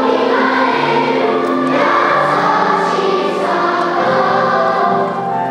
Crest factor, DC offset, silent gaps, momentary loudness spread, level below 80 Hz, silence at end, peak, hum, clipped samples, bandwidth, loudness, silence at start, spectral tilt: 14 dB; under 0.1%; none; 3 LU; -58 dBFS; 0 s; 0 dBFS; none; under 0.1%; 12 kHz; -14 LUFS; 0 s; -5.5 dB/octave